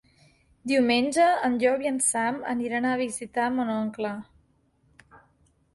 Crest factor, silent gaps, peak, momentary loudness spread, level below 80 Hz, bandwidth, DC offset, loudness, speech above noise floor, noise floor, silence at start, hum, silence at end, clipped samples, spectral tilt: 18 dB; none; -10 dBFS; 9 LU; -64 dBFS; 11.5 kHz; under 0.1%; -25 LUFS; 41 dB; -66 dBFS; 0.65 s; none; 0.55 s; under 0.1%; -3 dB/octave